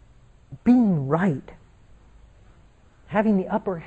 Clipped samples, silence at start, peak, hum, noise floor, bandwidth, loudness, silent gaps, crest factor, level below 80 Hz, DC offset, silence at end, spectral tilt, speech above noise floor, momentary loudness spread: under 0.1%; 0.5 s; -8 dBFS; none; -54 dBFS; 7.8 kHz; -22 LUFS; none; 16 dB; -52 dBFS; under 0.1%; 0 s; -9.5 dB/octave; 33 dB; 8 LU